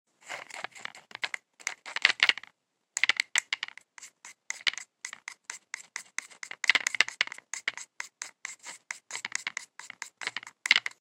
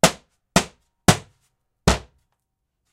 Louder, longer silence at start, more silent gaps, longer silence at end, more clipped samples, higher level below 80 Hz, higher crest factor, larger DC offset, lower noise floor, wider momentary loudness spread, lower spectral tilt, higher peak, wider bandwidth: second, -30 LUFS vs -22 LUFS; first, 0.25 s vs 0.05 s; neither; second, 0.1 s vs 0.95 s; neither; second, -80 dBFS vs -36 dBFS; first, 32 dB vs 24 dB; neither; second, -65 dBFS vs -77 dBFS; first, 18 LU vs 11 LU; second, 2.5 dB/octave vs -3.5 dB/octave; about the same, -2 dBFS vs 0 dBFS; about the same, 16.5 kHz vs 16 kHz